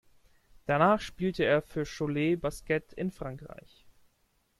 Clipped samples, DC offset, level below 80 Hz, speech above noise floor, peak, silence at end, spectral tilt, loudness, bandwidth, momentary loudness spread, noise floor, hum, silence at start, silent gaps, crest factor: under 0.1%; under 0.1%; -54 dBFS; 42 dB; -10 dBFS; 1 s; -6.5 dB/octave; -30 LUFS; 14 kHz; 16 LU; -72 dBFS; none; 0.7 s; none; 22 dB